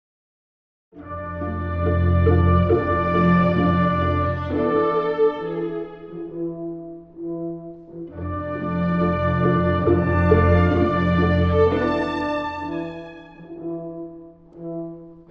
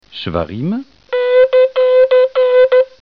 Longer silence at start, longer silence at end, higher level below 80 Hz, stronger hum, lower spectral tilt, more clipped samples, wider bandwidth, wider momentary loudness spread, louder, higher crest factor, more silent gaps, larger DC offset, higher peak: first, 0.95 s vs 0.15 s; about the same, 0.1 s vs 0.15 s; first, -36 dBFS vs -46 dBFS; neither; first, -9.5 dB/octave vs -8 dB/octave; neither; about the same, 5.6 kHz vs 5.2 kHz; first, 18 LU vs 11 LU; second, -21 LUFS vs -13 LUFS; first, 18 dB vs 10 dB; neither; second, under 0.1% vs 0.2%; about the same, -2 dBFS vs -2 dBFS